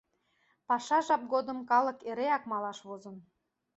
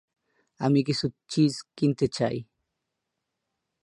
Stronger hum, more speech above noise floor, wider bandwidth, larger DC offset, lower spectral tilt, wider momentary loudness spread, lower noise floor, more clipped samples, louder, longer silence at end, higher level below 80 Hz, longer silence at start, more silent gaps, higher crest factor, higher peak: neither; second, 42 dB vs 57 dB; second, 8.2 kHz vs 11.5 kHz; neither; second, -4 dB/octave vs -6.5 dB/octave; first, 17 LU vs 6 LU; second, -73 dBFS vs -83 dBFS; neither; second, -31 LUFS vs -26 LUFS; second, 0.55 s vs 1.4 s; second, -80 dBFS vs -62 dBFS; about the same, 0.7 s vs 0.6 s; neither; about the same, 18 dB vs 18 dB; second, -14 dBFS vs -10 dBFS